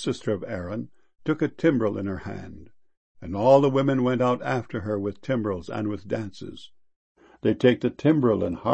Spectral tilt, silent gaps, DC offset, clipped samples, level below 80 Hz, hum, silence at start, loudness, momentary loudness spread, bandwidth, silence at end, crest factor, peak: -7.5 dB/octave; 2.97-3.15 s, 6.96-7.15 s; 0.4%; under 0.1%; -56 dBFS; none; 0 s; -25 LUFS; 16 LU; 8.8 kHz; 0 s; 20 dB; -4 dBFS